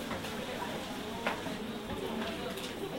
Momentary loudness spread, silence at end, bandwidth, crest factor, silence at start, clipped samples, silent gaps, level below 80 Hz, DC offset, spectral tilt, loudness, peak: 3 LU; 0 s; 16 kHz; 20 dB; 0 s; under 0.1%; none; -56 dBFS; under 0.1%; -4 dB/octave; -38 LUFS; -18 dBFS